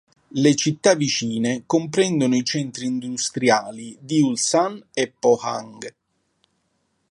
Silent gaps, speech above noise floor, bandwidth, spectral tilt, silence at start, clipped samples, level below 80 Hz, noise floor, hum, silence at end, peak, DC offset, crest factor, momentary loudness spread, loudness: none; 49 dB; 11.5 kHz; -4 dB/octave; 0.35 s; under 0.1%; -68 dBFS; -70 dBFS; none; 1.25 s; -2 dBFS; under 0.1%; 20 dB; 13 LU; -21 LUFS